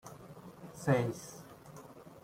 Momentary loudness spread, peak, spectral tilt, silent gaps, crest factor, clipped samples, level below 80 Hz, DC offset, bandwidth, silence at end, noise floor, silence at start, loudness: 21 LU; -16 dBFS; -6.5 dB/octave; none; 22 dB; under 0.1%; -70 dBFS; under 0.1%; 16.5 kHz; 0.05 s; -53 dBFS; 0.05 s; -34 LUFS